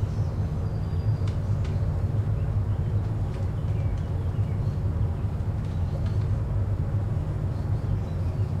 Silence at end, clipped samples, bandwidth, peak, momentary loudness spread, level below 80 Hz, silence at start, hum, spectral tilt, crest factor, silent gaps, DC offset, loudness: 0 s; under 0.1%; 7.2 kHz; -14 dBFS; 2 LU; -34 dBFS; 0 s; none; -9 dB/octave; 10 dB; none; under 0.1%; -28 LUFS